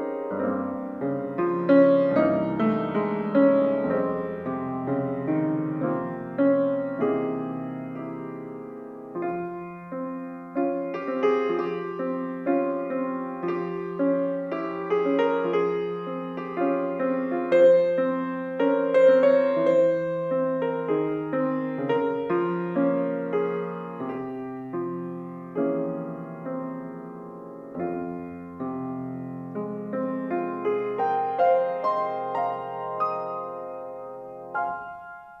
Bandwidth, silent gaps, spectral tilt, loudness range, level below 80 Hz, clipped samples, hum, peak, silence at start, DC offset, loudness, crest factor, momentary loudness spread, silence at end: 5.6 kHz; none; -9 dB/octave; 10 LU; -68 dBFS; under 0.1%; none; -6 dBFS; 0 s; under 0.1%; -26 LUFS; 20 dB; 15 LU; 0 s